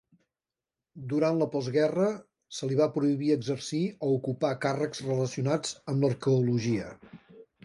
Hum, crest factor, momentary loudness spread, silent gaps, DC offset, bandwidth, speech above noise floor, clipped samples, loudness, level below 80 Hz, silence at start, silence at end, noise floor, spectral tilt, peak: none; 16 dB; 7 LU; none; under 0.1%; 11.5 kHz; over 62 dB; under 0.1%; -29 LUFS; -68 dBFS; 0.95 s; 0.2 s; under -90 dBFS; -6.5 dB/octave; -12 dBFS